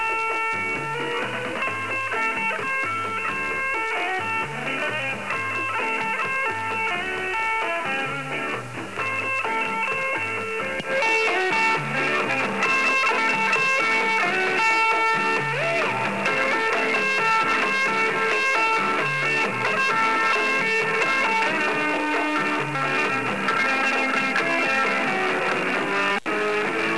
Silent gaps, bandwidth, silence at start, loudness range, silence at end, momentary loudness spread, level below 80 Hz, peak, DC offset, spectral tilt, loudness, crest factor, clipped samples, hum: none; 11 kHz; 0 s; 5 LU; 0 s; 6 LU; -64 dBFS; -10 dBFS; 0.6%; -3.5 dB/octave; -22 LUFS; 14 dB; under 0.1%; none